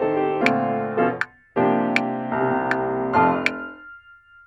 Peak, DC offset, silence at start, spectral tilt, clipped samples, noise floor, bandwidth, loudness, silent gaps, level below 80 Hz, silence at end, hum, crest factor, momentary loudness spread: -2 dBFS; under 0.1%; 0 s; -6.5 dB/octave; under 0.1%; -49 dBFS; 11 kHz; -22 LUFS; none; -60 dBFS; 0.45 s; none; 20 dB; 8 LU